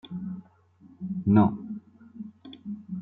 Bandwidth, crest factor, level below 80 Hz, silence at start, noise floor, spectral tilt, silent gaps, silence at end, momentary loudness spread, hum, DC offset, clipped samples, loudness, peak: 4 kHz; 22 dB; -64 dBFS; 0.05 s; -56 dBFS; -12 dB/octave; none; 0 s; 22 LU; none; under 0.1%; under 0.1%; -26 LUFS; -8 dBFS